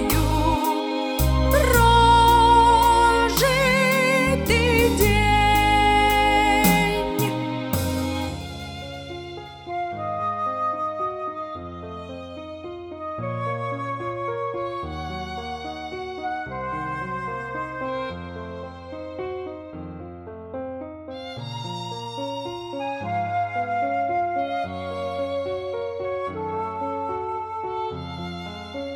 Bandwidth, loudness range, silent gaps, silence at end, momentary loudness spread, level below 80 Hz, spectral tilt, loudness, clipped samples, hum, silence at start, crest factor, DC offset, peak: 17.5 kHz; 15 LU; none; 0 s; 18 LU; -34 dBFS; -4.5 dB/octave; -22 LUFS; under 0.1%; none; 0 s; 18 dB; under 0.1%; -4 dBFS